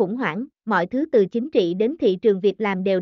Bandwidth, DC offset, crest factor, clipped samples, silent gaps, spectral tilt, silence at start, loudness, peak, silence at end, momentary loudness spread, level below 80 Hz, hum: 6.4 kHz; under 0.1%; 14 dB; under 0.1%; none; -5 dB/octave; 0 s; -21 LUFS; -6 dBFS; 0 s; 5 LU; -64 dBFS; none